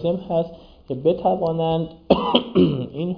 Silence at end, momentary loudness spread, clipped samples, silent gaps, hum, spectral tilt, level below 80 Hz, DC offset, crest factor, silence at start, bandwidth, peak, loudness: 0 s; 8 LU; under 0.1%; none; none; -9.5 dB/octave; -48 dBFS; under 0.1%; 20 dB; 0 s; 5.2 kHz; 0 dBFS; -21 LUFS